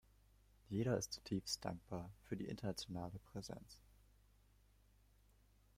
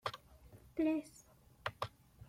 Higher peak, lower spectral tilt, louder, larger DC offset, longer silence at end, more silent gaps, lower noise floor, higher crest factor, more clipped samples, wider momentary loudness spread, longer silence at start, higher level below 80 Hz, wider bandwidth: second, -26 dBFS vs -22 dBFS; about the same, -5 dB/octave vs -5.5 dB/octave; second, -46 LUFS vs -41 LUFS; neither; first, 2 s vs 0.05 s; neither; first, -72 dBFS vs -61 dBFS; about the same, 22 dB vs 22 dB; neither; second, 12 LU vs 25 LU; first, 0.7 s vs 0.05 s; about the same, -68 dBFS vs -68 dBFS; about the same, 16 kHz vs 16 kHz